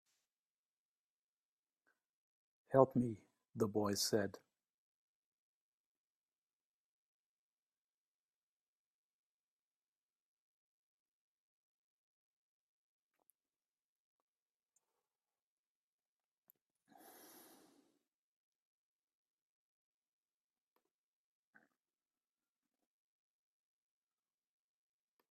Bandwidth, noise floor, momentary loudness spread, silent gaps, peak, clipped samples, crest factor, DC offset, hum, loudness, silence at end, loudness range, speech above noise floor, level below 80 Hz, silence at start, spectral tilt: 13.5 kHz; under -90 dBFS; 15 LU; none; -14 dBFS; under 0.1%; 34 dB; under 0.1%; none; -37 LUFS; 21 s; 5 LU; over 54 dB; -84 dBFS; 2.7 s; -5 dB/octave